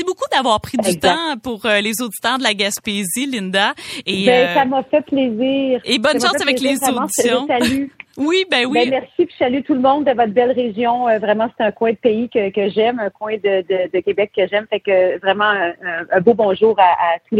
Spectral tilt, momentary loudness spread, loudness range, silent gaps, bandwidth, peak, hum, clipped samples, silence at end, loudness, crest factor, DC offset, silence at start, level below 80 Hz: -3.5 dB/octave; 6 LU; 2 LU; none; 16 kHz; 0 dBFS; none; under 0.1%; 0 s; -16 LUFS; 16 dB; under 0.1%; 0 s; -56 dBFS